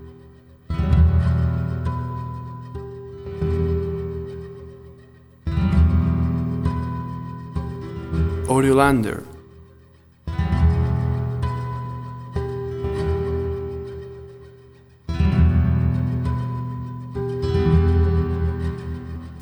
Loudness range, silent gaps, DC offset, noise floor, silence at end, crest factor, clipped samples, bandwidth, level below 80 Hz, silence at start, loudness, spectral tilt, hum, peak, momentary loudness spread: 6 LU; none; under 0.1%; -51 dBFS; 0 s; 20 dB; under 0.1%; 12 kHz; -28 dBFS; 0 s; -22 LUFS; -8 dB/octave; none; -2 dBFS; 17 LU